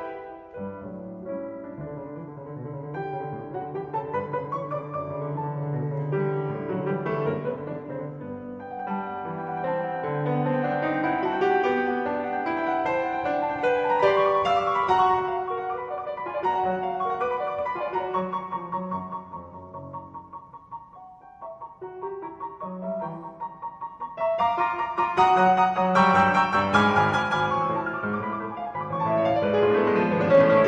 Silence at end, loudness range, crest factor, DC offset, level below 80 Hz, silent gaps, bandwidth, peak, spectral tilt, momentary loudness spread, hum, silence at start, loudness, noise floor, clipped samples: 0 s; 15 LU; 18 dB; under 0.1%; -60 dBFS; none; 9.4 kHz; -8 dBFS; -7 dB/octave; 17 LU; none; 0 s; -25 LUFS; -47 dBFS; under 0.1%